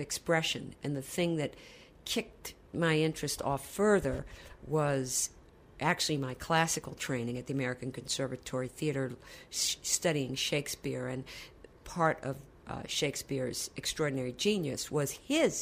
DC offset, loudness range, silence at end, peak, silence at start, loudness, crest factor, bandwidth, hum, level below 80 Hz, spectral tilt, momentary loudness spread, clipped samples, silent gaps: under 0.1%; 3 LU; 0 s; -14 dBFS; 0 s; -33 LUFS; 20 dB; 15.5 kHz; none; -58 dBFS; -3.5 dB/octave; 14 LU; under 0.1%; none